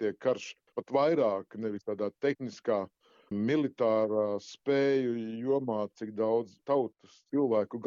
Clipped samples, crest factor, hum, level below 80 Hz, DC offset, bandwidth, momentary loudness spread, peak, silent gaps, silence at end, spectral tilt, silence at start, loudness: under 0.1%; 16 dB; none; -80 dBFS; under 0.1%; 7.4 kHz; 9 LU; -14 dBFS; none; 0 s; -5.5 dB/octave; 0 s; -31 LUFS